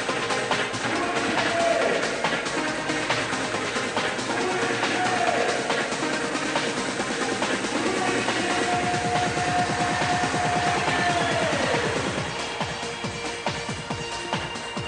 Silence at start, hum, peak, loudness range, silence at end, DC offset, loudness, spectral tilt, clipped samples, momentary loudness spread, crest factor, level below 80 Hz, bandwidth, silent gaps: 0 s; none; -10 dBFS; 2 LU; 0 s; under 0.1%; -25 LUFS; -3.5 dB/octave; under 0.1%; 6 LU; 16 dB; -52 dBFS; 10 kHz; none